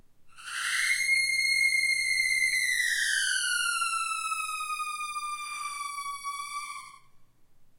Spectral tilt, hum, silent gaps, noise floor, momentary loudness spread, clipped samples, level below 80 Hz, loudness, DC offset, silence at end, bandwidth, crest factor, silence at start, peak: 4.5 dB/octave; none; none; -55 dBFS; 13 LU; under 0.1%; -66 dBFS; -27 LUFS; under 0.1%; 0.15 s; 16.5 kHz; 16 dB; 0.2 s; -14 dBFS